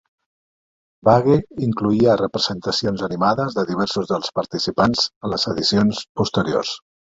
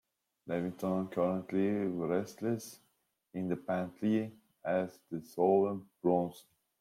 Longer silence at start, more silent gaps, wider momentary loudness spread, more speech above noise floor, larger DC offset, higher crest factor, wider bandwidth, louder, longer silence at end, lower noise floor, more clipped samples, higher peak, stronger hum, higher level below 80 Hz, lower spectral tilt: first, 1.05 s vs 0.45 s; first, 5.16-5.21 s, 6.09-6.15 s vs none; second, 7 LU vs 13 LU; first, over 71 dB vs 30 dB; neither; about the same, 18 dB vs 18 dB; second, 7.8 kHz vs 16 kHz; first, -20 LUFS vs -34 LUFS; second, 0.2 s vs 0.4 s; first, under -90 dBFS vs -63 dBFS; neither; first, -2 dBFS vs -16 dBFS; neither; first, -50 dBFS vs -76 dBFS; second, -5.5 dB/octave vs -7.5 dB/octave